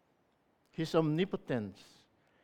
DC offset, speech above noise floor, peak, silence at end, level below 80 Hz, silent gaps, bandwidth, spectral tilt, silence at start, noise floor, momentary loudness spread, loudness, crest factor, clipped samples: under 0.1%; 40 dB; -16 dBFS; 0.7 s; -70 dBFS; none; 14.5 kHz; -7 dB/octave; 0.8 s; -74 dBFS; 14 LU; -34 LUFS; 22 dB; under 0.1%